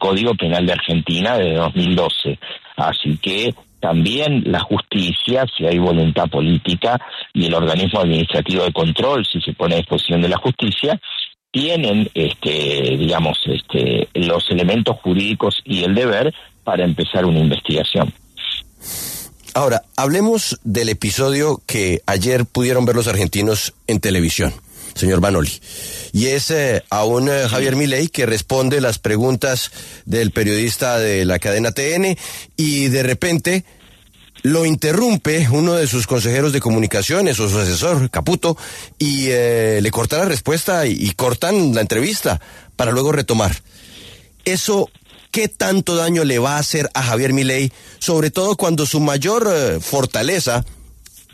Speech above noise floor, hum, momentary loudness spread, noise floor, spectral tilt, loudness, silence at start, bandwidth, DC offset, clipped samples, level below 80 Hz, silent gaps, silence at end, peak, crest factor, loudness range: 30 dB; none; 7 LU; -47 dBFS; -4.5 dB/octave; -17 LUFS; 0 s; 14 kHz; under 0.1%; under 0.1%; -40 dBFS; none; 0.45 s; -2 dBFS; 14 dB; 2 LU